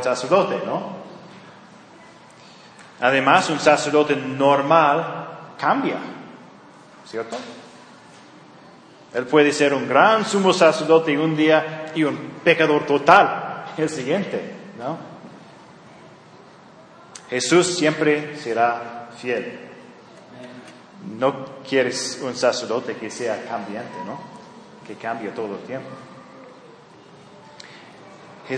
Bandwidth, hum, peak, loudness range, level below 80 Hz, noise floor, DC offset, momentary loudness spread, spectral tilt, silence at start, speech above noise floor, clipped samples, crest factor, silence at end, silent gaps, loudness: 10.5 kHz; none; 0 dBFS; 16 LU; -72 dBFS; -46 dBFS; under 0.1%; 24 LU; -4.5 dB/octave; 0 s; 27 dB; under 0.1%; 22 dB; 0 s; none; -20 LUFS